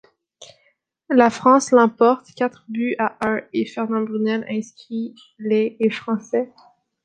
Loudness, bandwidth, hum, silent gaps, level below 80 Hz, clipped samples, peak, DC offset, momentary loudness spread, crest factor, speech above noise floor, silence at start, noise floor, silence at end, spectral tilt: -20 LUFS; 9.4 kHz; none; none; -66 dBFS; under 0.1%; -2 dBFS; under 0.1%; 15 LU; 18 dB; 45 dB; 0.4 s; -65 dBFS; 0.6 s; -5 dB/octave